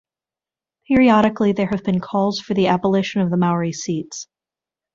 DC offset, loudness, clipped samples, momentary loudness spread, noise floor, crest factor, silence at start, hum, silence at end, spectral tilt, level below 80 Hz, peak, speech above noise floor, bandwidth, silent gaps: under 0.1%; -18 LUFS; under 0.1%; 11 LU; under -90 dBFS; 18 dB; 0.9 s; none; 0.7 s; -6 dB/octave; -52 dBFS; -2 dBFS; over 72 dB; 7.6 kHz; none